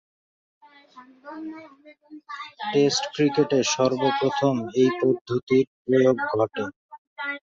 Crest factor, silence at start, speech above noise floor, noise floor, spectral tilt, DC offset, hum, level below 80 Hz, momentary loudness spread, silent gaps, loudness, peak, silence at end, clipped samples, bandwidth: 18 dB; 0.95 s; 27 dB; -50 dBFS; -5 dB/octave; under 0.1%; none; -66 dBFS; 17 LU; 5.21-5.25 s, 5.43-5.47 s, 5.67-5.85 s, 6.76-6.89 s, 6.98-7.16 s; -23 LUFS; -8 dBFS; 0.2 s; under 0.1%; 7.8 kHz